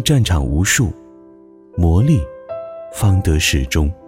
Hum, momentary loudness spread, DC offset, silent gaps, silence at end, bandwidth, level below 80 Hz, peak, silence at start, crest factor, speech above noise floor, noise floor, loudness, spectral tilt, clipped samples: none; 15 LU; under 0.1%; none; 0.15 s; 16.5 kHz; -24 dBFS; -2 dBFS; 0 s; 14 dB; 29 dB; -43 dBFS; -16 LUFS; -5 dB/octave; under 0.1%